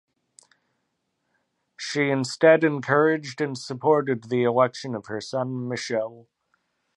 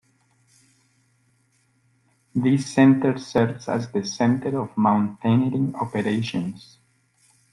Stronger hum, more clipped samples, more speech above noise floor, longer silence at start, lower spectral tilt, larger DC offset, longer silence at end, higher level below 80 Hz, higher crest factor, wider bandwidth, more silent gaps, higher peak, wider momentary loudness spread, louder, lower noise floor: neither; neither; first, 53 dB vs 44 dB; second, 1.8 s vs 2.35 s; second, -5.5 dB/octave vs -7 dB/octave; neither; second, 0.75 s vs 0.95 s; second, -74 dBFS vs -62 dBFS; about the same, 22 dB vs 18 dB; about the same, 11.5 kHz vs 11.5 kHz; neither; about the same, -4 dBFS vs -6 dBFS; about the same, 12 LU vs 11 LU; about the same, -23 LUFS vs -22 LUFS; first, -76 dBFS vs -65 dBFS